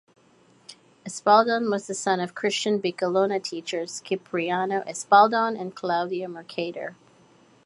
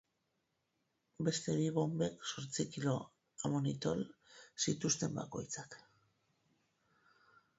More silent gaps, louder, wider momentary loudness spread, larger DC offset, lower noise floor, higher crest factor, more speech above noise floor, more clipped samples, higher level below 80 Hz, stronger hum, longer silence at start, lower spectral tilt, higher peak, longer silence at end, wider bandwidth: neither; first, -24 LUFS vs -38 LUFS; about the same, 14 LU vs 13 LU; neither; second, -58 dBFS vs -84 dBFS; about the same, 22 dB vs 20 dB; second, 34 dB vs 46 dB; neither; second, -78 dBFS vs -72 dBFS; neither; second, 0.7 s vs 1.2 s; second, -4 dB/octave vs -6 dB/octave; first, -4 dBFS vs -22 dBFS; second, 0.75 s vs 1.8 s; first, 11.5 kHz vs 8 kHz